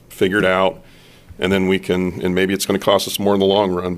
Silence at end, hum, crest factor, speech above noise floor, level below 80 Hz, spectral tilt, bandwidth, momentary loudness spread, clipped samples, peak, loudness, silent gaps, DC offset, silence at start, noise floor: 0 s; none; 18 dB; 26 dB; -48 dBFS; -5 dB/octave; 15.5 kHz; 5 LU; under 0.1%; 0 dBFS; -17 LUFS; none; under 0.1%; 0.1 s; -43 dBFS